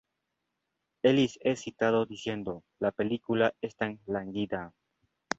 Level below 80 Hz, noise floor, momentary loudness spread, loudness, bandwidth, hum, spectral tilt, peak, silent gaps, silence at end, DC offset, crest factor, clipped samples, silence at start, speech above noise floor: -64 dBFS; -83 dBFS; 10 LU; -30 LUFS; 8 kHz; none; -5.5 dB/octave; -10 dBFS; none; 0.7 s; under 0.1%; 20 dB; under 0.1%; 1.05 s; 53 dB